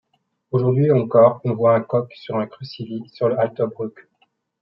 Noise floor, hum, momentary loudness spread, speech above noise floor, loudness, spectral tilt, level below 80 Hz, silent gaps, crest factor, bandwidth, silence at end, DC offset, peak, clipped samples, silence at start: -65 dBFS; none; 16 LU; 46 dB; -19 LUFS; -11 dB/octave; -68 dBFS; none; 18 dB; 5.8 kHz; 0.7 s; under 0.1%; -2 dBFS; under 0.1%; 0.55 s